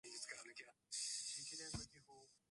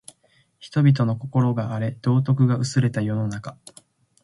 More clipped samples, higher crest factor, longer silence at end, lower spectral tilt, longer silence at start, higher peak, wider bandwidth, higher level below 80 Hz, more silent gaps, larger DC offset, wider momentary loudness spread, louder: neither; about the same, 20 dB vs 16 dB; second, 0.15 s vs 0.7 s; second, -1 dB/octave vs -7.5 dB/octave; second, 0.05 s vs 0.6 s; second, -34 dBFS vs -6 dBFS; about the same, 11.5 kHz vs 11.5 kHz; second, -70 dBFS vs -58 dBFS; neither; neither; first, 20 LU vs 9 LU; second, -48 LUFS vs -22 LUFS